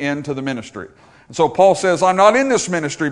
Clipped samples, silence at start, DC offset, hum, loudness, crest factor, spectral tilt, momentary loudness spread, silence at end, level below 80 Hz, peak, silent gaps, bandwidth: under 0.1%; 0 s; under 0.1%; none; -16 LUFS; 16 dB; -4.5 dB/octave; 17 LU; 0 s; -56 dBFS; 0 dBFS; none; 11 kHz